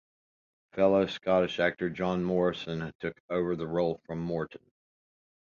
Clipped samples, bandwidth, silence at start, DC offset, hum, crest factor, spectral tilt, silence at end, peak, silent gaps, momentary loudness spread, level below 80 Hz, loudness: under 0.1%; 7.2 kHz; 0.75 s; under 0.1%; none; 18 dB; -7 dB/octave; 0.85 s; -12 dBFS; 2.95-2.99 s, 3.20-3.29 s; 11 LU; -60 dBFS; -30 LUFS